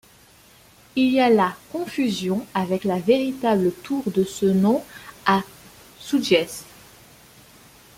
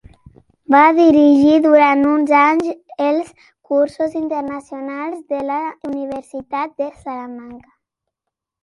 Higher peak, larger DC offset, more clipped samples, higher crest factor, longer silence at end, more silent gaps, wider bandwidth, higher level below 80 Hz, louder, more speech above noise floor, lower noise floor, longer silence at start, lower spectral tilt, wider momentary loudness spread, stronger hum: about the same, -2 dBFS vs 0 dBFS; neither; neither; about the same, 20 dB vs 16 dB; first, 1.35 s vs 1.05 s; neither; first, 16.5 kHz vs 11 kHz; about the same, -60 dBFS vs -56 dBFS; second, -22 LUFS vs -15 LUFS; second, 31 dB vs 66 dB; second, -52 dBFS vs -82 dBFS; first, 0.95 s vs 0.7 s; about the same, -5.5 dB/octave vs -6 dB/octave; second, 12 LU vs 17 LU; neither